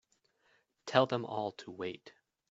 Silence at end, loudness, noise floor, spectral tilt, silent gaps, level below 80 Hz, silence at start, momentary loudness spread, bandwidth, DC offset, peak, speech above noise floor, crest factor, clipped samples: 0.4 s; -35 LUFS; -74 dBFS; -3.5 dB/octave; none; -80 dBFS; 0.85 s; 17 LU; 8 kHz; under 0.1%; -8 dBFS; 40 dB; 28 dB; under 0.1%